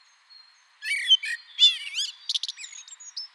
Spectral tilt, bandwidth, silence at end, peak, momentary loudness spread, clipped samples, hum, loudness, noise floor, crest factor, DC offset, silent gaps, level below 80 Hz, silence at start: 12 dB/octave; 13.5 kHz; 0.1 s; -6 dBFS; 20 LU; under 0.1%; none; -22 LUFS; -55 dBFS; 22 dB; under 0.1%; none; under -90 dBFS; 0.8 s